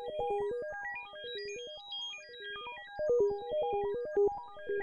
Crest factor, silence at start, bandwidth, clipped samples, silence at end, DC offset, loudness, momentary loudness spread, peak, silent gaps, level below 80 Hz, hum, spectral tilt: 14 dB; 0 s; 7 kHz; under 0.1%; 0 s; under 0.1%; -36 LUFS; 12 LU; -20 dBFS; none; -64 dBFS; none; -3.5 dB/octave